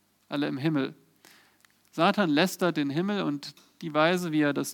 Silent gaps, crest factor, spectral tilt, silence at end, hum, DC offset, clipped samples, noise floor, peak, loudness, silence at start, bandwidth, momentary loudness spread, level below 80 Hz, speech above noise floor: none; 20 dB; -5.5 dB/octave; 0 s; none; under 0.1%; under 0.1%; -63 dBFS; -8 dBFS; -27 LUFS; 0.3 s; 19 kHz; 12 LU; -80 dBFS; 37 dB